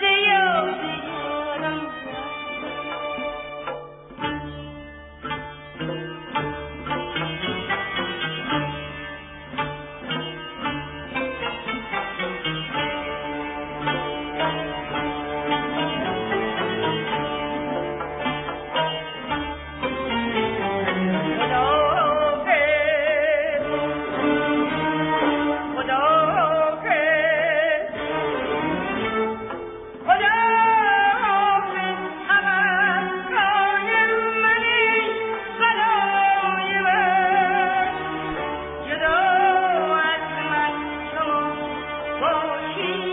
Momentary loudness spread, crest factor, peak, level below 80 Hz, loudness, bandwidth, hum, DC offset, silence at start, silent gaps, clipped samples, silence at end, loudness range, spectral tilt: 12 LU; 18 dB; -4 dBFS; -50 dBFS; -22 LUFS; 4 kHz; none; under 0.1%; 0 s; none; under 0.1%; 0 s; 10 LU; -8.5 dB/octave